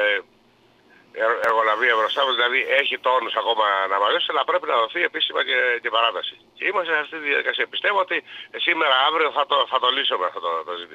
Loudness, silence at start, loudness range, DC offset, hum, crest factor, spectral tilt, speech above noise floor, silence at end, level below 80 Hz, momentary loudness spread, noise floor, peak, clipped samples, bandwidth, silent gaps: -20 LUFS; 0 s; 2 LU; under 0.1%; none; 18 dB; -2 dB/octave; 35 dB; 0 s; -76 dBFS; 7 LU; -57 dBFS; -4 dBFS; under 0.1%; 10.5 kHz; none